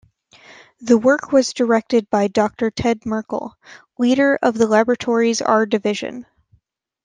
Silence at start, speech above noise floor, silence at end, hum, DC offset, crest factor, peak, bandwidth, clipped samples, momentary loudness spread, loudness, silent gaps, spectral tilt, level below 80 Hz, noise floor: 0.8 s; 45 dB; 0.85 s; none; under 0.1%; 16 dB; -2 dBFS; 9.6 kHz; under 0.1%; 12 LU; -18 LUFS; none; -4.5 dB/octave; -54 dBFS; -62 dBFS